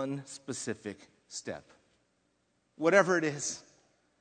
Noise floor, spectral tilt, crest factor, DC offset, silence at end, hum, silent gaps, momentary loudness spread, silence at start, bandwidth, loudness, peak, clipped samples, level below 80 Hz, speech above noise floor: -75 dBFS; -4 dB/octave; 26 dB; under 0.1%; 0.6 s; 60 Hz at -65 dBFS; none; 19 LU; 0 s; 9.4 kHz; -31 LUFS; -8 dBFS; under 0.1%; -78 dBFS; 43 dB